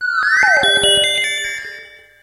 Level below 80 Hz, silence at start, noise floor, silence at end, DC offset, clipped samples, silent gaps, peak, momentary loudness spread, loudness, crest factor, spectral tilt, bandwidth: -48 dBFS; 0 s; -38 dBFS; 0.35 s; under 0.1%; under 0.1%; none; -2 dBFS; 14 LU; -13 LUFS; 14 dB; 0.5 dB/octave; 15.5 kHz